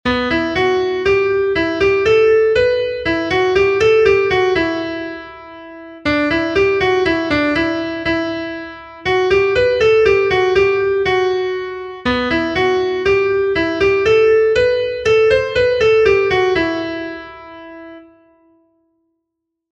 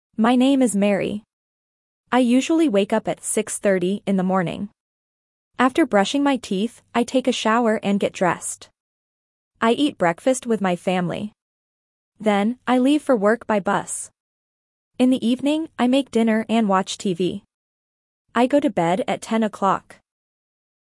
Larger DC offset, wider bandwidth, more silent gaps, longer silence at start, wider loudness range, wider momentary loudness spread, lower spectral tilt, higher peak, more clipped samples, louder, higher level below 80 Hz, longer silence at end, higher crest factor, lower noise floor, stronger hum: neither; second, 8 kHz vs 12 kHz; second, none vs 1.33-2.04 s, 4.80-5.51 s, 8.80-9.51 s, 11.42-12.12 s, 14.20-14.91 s, 17.54-18.25 s; second, 0.05 s vs 0.2 s; about the same, 4 LU vs 2 LU; first, 14 LU vs 9 LU; about the same, -5.5 dB/octave vs -5 dB/octave; about the same, -2 dBFS vs -4 dBFS; neither; first, -15 LUFS vs -21 LUFS; first, -40 dBFS vs -64 dBFS; first, 1.7 s vs 1.05 s; about the same, 14 dB vs 18 dB; second, -77 dBFS vs under -90 dBFS; neither